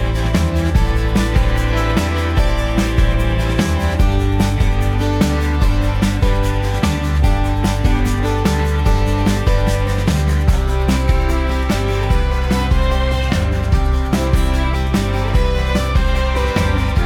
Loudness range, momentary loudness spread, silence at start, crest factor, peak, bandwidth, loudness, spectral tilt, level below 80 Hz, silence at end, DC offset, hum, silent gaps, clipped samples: 1 LU; 2 LU; 0 s; 14 dB; 0 dBFS; 16.5 kHz; -17 LUFS; -6 dB/octave; -18 dBFS; 0 s; under 0.1%; none; none; under 0.1%